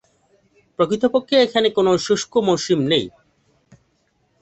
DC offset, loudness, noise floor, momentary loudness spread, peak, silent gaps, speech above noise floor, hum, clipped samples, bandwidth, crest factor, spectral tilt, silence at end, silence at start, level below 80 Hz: under 0.1%; -18 LUFS; -65 dBFS; 5 LU; -2 dBFS; none; 47 dB; none; under 0.1%; 8.2 kHz; 18 dB; -4.5 dB/octave; 1.35 s; 0.8 s; -60 dBFS